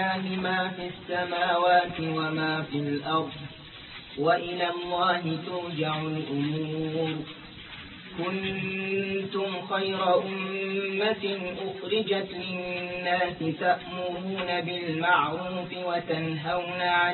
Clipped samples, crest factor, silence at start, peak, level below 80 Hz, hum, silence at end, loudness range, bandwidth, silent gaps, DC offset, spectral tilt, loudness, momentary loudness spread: under 0.1%; 18 dB; 0 s; -10 dBFS; -62 dBFS; none; 0 s; 4 LU; 4.4 kHz; none; under 0.1%; -9.5 dB/octave; -28 LUFS; 10 LU